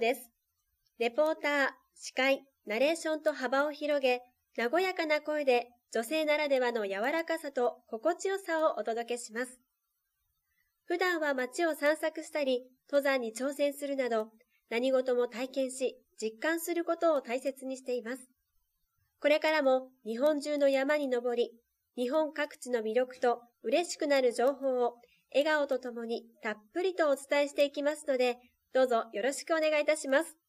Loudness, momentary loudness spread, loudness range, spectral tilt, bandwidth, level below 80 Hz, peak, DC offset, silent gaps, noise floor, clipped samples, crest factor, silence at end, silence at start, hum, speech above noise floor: -31 LUFS; 9 LU; 4 LU; -2.5 dB/octave; 15.5 kHz; -86 dBFS; -16 dBFS; under 0.1%; none; -83 dBFS; under 0.1%; 16 dB; 0.15 s; 0 s; none; 52 dB